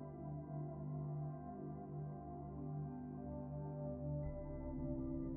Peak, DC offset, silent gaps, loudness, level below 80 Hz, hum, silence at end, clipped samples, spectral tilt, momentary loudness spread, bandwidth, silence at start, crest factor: -32 dBFS; under 0.1%; none; -47 LUFS; -56 dBFS; 50 Hz at -60 dBFS; 0 s; under 0.1%; -10.5 dB/octave; 5 LU; 2.1 kHz; 0 s; 12 dB